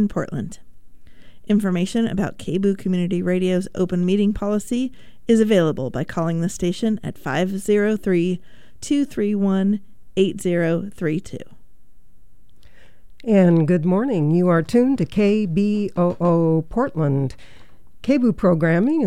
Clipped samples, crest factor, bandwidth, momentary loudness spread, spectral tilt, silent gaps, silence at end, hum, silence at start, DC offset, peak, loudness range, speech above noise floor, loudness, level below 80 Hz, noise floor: under 0.1%; 16 dB; 14 kHz; 9 LU; -7.5 dB/octave; none; 0 s; none; 0 s; 2%; -4 dBFS; 5 LU; 32 dB; -20 LUFS; -46 dBFS; -52 dBFS